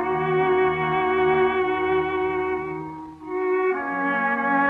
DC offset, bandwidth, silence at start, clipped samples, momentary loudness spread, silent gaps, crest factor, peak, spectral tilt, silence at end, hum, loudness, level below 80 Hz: under 0.1%; 4.1 kHz; 0 s; under 0.1%; 11 LU; none; 12 dB; -10 dBFS; -8 dB/octave; 0 s; none; -22 LUFS; -52 dBFS